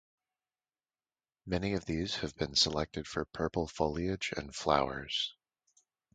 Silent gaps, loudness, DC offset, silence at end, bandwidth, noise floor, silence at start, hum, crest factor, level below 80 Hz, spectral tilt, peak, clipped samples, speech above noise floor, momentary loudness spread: none; -34 LUFS; under 0.1%; 0.8 s; 9.4 kHz; under -90 dBFS; 1.45 s; none; 26 dB; -52 dBFS; -4 dB/octave; -10 dBFS; under 0.1%; over 56 dB; 9 LU